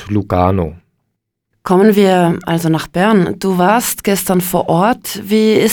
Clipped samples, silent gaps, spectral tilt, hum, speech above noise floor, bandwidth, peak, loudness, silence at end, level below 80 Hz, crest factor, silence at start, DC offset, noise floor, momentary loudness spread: under 0.1%; none; -5.5 dB/octave; none; 59 dB; over 20 kHz; 0 dBFS; -13 LUFS; 0 s; -44 dBFS; 14 dB; 0 s; 0.1%; -72 dBFS; 6 LU